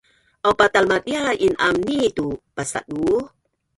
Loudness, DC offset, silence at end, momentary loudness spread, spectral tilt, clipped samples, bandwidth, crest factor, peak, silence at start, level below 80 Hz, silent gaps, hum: -20 LUFS; under 0.1%; 0.5 s; 11 LU; -4 dB/octave; under 0.1%; 11.5 kHz; 18 dB; -2 dBFS; 0.45 s; -50 dBFS; none; none